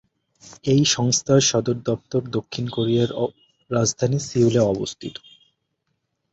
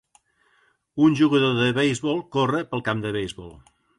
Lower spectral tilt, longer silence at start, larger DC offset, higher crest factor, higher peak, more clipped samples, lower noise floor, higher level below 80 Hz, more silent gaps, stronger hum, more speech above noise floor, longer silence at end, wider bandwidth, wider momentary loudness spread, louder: second, -4.5 dB/octave vs -6 dB/octave; second, 0.45 s vs 0.95 s; neither; about the same, 16 dB vs 16 dB; about the same, -6 dBFS vs -8 dBFS; neither; first, -75 dBFS vs -64 dBFS; about the same, -54 dBFS vs -56 dBFS; neither; neither; first, 54 dB vs 42 dB; first, 1.2 s vs 0.4 s; second, 8 kHz vs 11.5 kHz; about the same, 12 LU vs 12 LU; about the same, -21 LUFS vs -22 LUFS